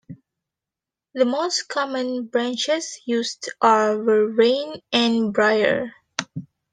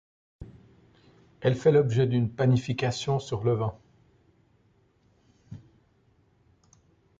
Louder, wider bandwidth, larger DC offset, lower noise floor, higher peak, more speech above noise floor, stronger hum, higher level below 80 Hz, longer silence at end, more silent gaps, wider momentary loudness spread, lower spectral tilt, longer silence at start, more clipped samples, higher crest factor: first, -21 LUFS vs -26 LUFS; first, 10 kHz vs 7.8 kHz; neither; first, -88 dBFS vs -65 dBFS; first, -4 dBFS vs -10 dBFS; first, 68 dB vs 41 dB; neither; second, -70 dBFS vs -58 dBFS; second, 0.3 s vs 1.6 s; neither; second, 12 LU vs 27 LU; second, -3.5 dB/octave vs -7 dB/octave; second, 0.1 s vs 0.4 s; neither; about the same, 18 dB vs 20 dB